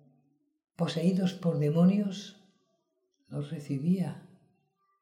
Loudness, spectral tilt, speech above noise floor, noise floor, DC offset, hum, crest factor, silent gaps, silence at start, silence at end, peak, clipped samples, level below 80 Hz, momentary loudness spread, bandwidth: -30 LUFS; -8 dB/octave; 49 dB; -77 dBFS; under 0.1%; none; 16 dB; none; 0.8 s; 0.8 s; -14 dBFS; under 0.1%; -78 dBFS; 17 LU; 11 kHz